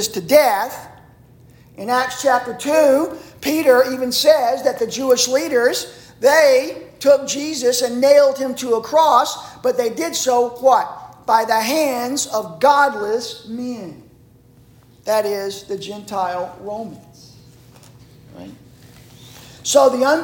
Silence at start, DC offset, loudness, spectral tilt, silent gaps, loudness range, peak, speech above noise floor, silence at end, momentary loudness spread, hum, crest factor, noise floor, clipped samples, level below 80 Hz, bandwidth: 0 s; under 0.1%; -17 LUFS; -2.5 dB/octave; none; 10 LU; -2 dBFS; 32 dB; 0 s; 15 LU; none; 16 dB; -49 dBFS; under 0.1%; -58 dBFS; 17 kHz